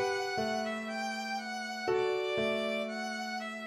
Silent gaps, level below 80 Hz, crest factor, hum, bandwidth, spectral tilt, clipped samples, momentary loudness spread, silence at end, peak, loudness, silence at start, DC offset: none; -72 dBFS; 14 dB; none; 15 kHz; -3.5 dB/octave; under 0.1%; 5 LU; 0 s; -20 dBFS; -34 LUFS; 0 s; under 0.1%